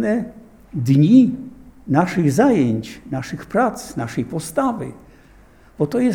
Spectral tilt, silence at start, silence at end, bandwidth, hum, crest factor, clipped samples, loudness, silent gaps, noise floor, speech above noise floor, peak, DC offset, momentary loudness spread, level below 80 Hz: -7.5 dB/octave; 0 s; 0 s; 16.5 kHz; none; 18 dB; under 0.1%; -19 LUFS; none; -48 dBFS; 30 dB; -2 dBFS; under 0.1%; 17 LU; -50 dBFS